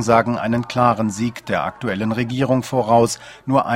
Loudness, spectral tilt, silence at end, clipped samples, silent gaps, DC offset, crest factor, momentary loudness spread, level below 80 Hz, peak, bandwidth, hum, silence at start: -19 LUFS; -6 dB/octave; 0 s; under 0.1%; none; under 0.1%; 18 dB; 7 LU; -52 dBFS; 0 dBFS; 16 kHz; none; 0 s